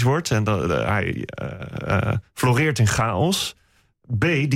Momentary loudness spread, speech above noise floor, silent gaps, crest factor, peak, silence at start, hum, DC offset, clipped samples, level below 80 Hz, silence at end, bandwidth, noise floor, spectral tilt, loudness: 11 LU; 38 dB; none; 12 dB; -10 dBFS; 0 s; none; under 0.1%; under 0.1%; -44 dBFS; 0 s; 16 kHz; -59 dBFS; -5.5 dB/octave; -22 LUFS